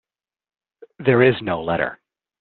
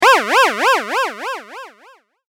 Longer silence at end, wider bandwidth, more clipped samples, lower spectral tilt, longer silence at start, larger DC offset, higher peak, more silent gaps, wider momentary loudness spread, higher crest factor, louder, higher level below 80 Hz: second, 0.45 s vs 0.65 s; second, 4.4 kHz vs 19 kHz; neither; first, -5 dB/octave vs -0.5 dB/octave; first, 1 s vs 0 s; neither; about the same, -2 dBFS vs 0 dBFS; neither; second, 8 LU vs 20 LU; about the same, 20 dB vs 16 dB; second, -19 LUFS vs -15 LUFS; first, -56 dBFS vs -70 dBFS